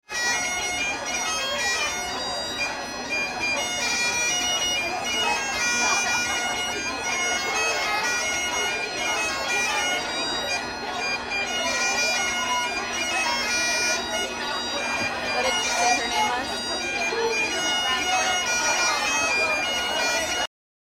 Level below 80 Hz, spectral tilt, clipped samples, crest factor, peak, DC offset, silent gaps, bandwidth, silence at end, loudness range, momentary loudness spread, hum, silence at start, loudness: -52 dBFS; 0 dB/octave; under 0.1%; 16 dB; -10 dBFS; under 0.1%; none; 17 kHz; 0.4 s; 2 LU; 5 LU; none; 0.1 s; -23 LUFS